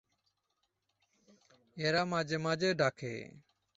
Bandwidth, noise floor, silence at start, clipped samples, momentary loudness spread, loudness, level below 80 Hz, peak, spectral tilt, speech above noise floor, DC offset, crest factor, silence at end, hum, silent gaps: 8 kHz; -82 dBFS; 1.75 s; under 0.1%; 16 LU; -33 LUFS; -72 dBFS; -16 dBFS; -3.5 dB/octave; 48 dB; under 0.1%; 20 dB; 0.4 s; none; none